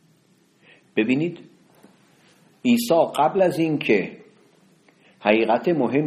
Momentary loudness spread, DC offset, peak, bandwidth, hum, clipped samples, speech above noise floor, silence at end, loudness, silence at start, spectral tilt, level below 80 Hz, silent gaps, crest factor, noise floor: 9 LU; under 0.1%; -2 dBFS; 14.5 kHz; none; under 0.1%; 40 dB; 0 s; -21 LUFS; 0.95 s; -6 dB/octave; -68 dBFS; none; 20 dB; -60 dBFS